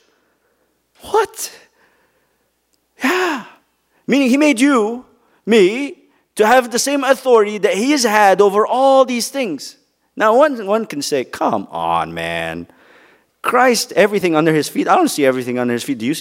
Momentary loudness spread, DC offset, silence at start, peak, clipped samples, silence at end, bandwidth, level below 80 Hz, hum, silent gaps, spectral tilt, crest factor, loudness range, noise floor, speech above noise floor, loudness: 12 LU; under 0.1%; 1.05 s; 0 dBFS; under 0.1%; 0 s; 16 kHz; -60 dBFS; none; none; -4 dB/octave; 16 dB; 8 LU; -65 dBFS; 50 dB; -15 LUFS